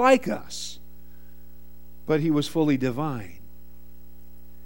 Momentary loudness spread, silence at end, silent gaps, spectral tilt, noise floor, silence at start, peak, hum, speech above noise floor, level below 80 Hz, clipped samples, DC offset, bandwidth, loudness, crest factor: 17 LU; 1.35 s; none; -5.5 dB/octave; -50 dBFS; 0 s; -6 dBFS; 60 Hz at -50 dBFS; 27 dB; -52 dBFS; under 0.1%; 1%; 17 kHz; -25 LUFS; 22 dB